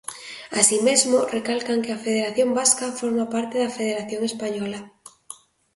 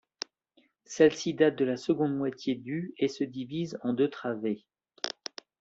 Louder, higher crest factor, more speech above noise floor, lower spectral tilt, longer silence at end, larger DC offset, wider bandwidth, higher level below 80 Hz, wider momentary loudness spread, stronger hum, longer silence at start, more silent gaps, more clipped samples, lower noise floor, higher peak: first, -22 LUFS vs -30 LUFS; about the same, 22 dB vs 22 dB; second, 23 dB vs 40 dB; second, -2 dB/octave vs -5.5 dB/octave; about the same, 0.4 s vs 0.5 s; neither; first, 12 kHz vs 8 kHz; about the same, -68 dBFS vs -72 dBFS; first, 19 LU vs 16 LU; neither; second, 0.1 s vs 0.9 s; neither; neither; second, -45 dBFS vs -69 dBFS; first, -2 dBFS vs -8 dBFS